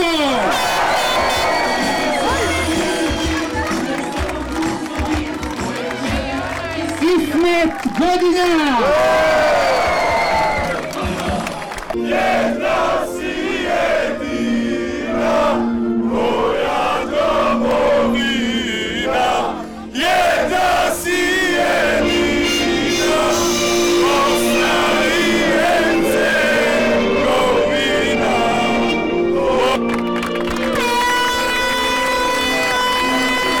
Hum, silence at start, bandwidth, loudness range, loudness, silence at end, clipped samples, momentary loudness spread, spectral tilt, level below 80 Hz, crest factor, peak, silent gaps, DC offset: none; 0 s; 18 kHz; 4 LU; -16 LUFS; 0 s; under 0.1%; 7 LU; -3.5 dB/octave; -36 dBFS; 8 dB; -8 dBFS; none; 1%